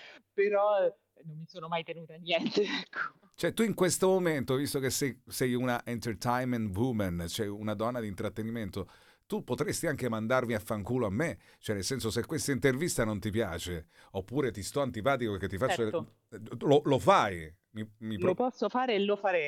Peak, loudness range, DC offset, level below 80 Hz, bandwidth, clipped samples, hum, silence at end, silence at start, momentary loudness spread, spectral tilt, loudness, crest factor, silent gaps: -10 dBFS; 4 LU; under 0.1%; -58 dBFS; 17.5 kHz; under 0.1%; none; 0 s; 0 s; 14 LU; -5 dB/octave; -31 LUFS; 22 dB; none